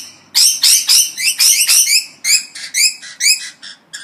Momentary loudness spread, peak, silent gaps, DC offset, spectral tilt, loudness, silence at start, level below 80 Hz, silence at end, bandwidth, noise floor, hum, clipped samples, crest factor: 9 LU; 0 dBFS; none; under 0.1%; 5.5 dB/octave; -10 LUFS; 0 s; -70 dBFS; 0 s; over 20 kHz; -34 dBFS; none; under 0.1%; 14 dB